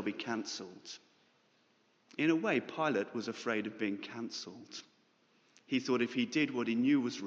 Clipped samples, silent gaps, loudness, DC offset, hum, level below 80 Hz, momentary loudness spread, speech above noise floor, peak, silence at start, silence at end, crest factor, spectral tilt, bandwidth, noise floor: under 0.1%; none; -35 LUFS; under 0.1%; none; -86 dBFS; 17 LU; 37 dB; -18 dBFS; 0 s; 0 s; 18 dB; -4.5 dB/octave; 7.8 kHz; -72 dBFS